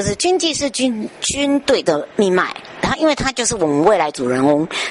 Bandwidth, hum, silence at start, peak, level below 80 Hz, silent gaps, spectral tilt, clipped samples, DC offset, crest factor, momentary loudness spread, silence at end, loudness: 11.5 kHz; none; 0 s; -2 dBFS; -42 dBFS; none; -3.5 dB/octave; under 0.1%; under 0.1%; 14 dB; 5 LU; 0 s; -17 LUFS